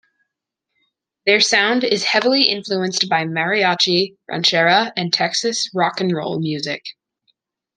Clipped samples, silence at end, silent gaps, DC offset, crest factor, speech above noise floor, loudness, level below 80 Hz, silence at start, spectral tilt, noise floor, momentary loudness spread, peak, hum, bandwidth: under 0.1%; 0.85 s; none; under 0.1%; 18 dB; 62 dB; -17 LUFS; -68 dBFS; 1.25 s; -3 dB/octave; -80 dBFS; 9 LU; 0 dBFS; none; 12 kHz